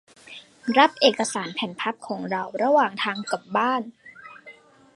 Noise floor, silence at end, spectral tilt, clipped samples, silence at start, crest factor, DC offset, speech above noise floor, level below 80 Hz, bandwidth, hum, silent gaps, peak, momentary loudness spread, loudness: -49 dBFS; 0.45 s; -3.5 dB/octave; under 0.1%; 0.25 s; 24 dB; under 0.1%; 26 dB; -74 dBFS; 11.5 kHz; none; none; -2 dBFS; 24 LU; -23 LUFS